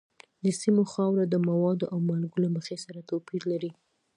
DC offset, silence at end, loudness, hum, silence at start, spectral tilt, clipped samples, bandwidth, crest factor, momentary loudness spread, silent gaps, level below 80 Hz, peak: under 0.1%; 0.45 s; -28 LUFS; none; 0.45 s; -7 dB/octave; under 0.1%; 11 kHz; 16 dB; 10 LU; none; -76 dBFS; -12 dBFS